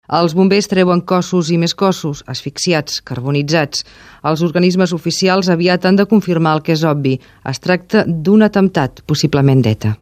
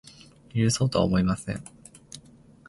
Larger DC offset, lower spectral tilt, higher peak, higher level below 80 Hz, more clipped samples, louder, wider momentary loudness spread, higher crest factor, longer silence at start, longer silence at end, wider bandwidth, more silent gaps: neither; about the same, -6 dB/octave vs -5.5 dB/octave; first, 0 dBFS vs -8 dBFS; about the same, -48 dBFS vs -48 dBFS; neither; first, -14 LUFS vs -26 LUFS; second, 9 LU vs 22 LU; about the same, 14 dB vs 18 dB; second, 0.1 s vs 0.55 s; second, 0.05 s vs 0.5 s; first, 15 kHz vs 11.5 kHz; neither